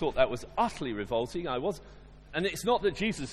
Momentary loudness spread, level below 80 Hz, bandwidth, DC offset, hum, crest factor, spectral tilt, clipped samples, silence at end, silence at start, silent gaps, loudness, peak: 8 LU; -50 dBFS; 14.5 kHz; under 0.1%; none; 22 dB; -5 dB/octave; under 0.1%; 0 s; 0 s; none; -31 LUFS; -10 dBFS